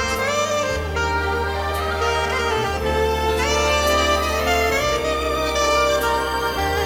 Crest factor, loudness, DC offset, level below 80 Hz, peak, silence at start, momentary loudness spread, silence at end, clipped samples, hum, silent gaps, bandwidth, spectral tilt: 14 dB; -20 LUFS; under 0.1%; -30 dBFS; -6 dBFS; 0 s; 5 LU; 0 s; under 0.1%; none; none; 17.5 kHz; -3.5 dB/octave